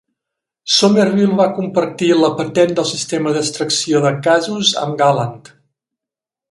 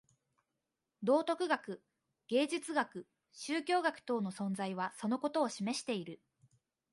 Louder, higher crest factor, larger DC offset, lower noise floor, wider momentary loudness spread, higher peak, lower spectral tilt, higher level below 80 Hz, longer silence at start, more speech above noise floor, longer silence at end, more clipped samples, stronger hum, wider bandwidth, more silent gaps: first, -15 LUFS vs -36 LUFS; about the same, 16 dB vs 20 dB; neither; about the same, -87 dBFS vs -88 dBFS; second, 6 LU vs 14 LU; first, 0 dBFS vs -18 dBFS; about the same, -4 dB/octave vs -4.5 dB/octave; first, -60 dBFS vs -86 dBFS; second, 0.65 s vs 1 s; first, 72 dB vs 52 dB; first, 1.1 s vs 0.8 s; neither; neither; about the same, 11.5 kHz vs 11.5 kHz; neither